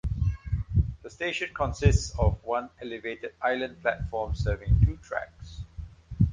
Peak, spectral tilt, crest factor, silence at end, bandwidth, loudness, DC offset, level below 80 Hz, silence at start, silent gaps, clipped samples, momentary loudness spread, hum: -8 dBFS; -6.5 dB/octave; 20 dB; 0 s; 9.4 kHz; -29 LUFS; under 0.1%; -32 dBFS; 0.05 s; none; under 0.1%; 17 LU; none